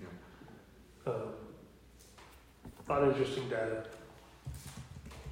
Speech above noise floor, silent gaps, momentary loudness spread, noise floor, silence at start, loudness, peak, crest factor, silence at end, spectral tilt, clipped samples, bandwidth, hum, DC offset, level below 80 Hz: 26 dB; none; 26 LU; -59 dBFS; 0 s; -36 LUFS; -18 dBFS; 20 dB; 0 s; -6 dB/octave; under 0.1%; 16.5 kHz; none; under 0.1%; -58 dBFS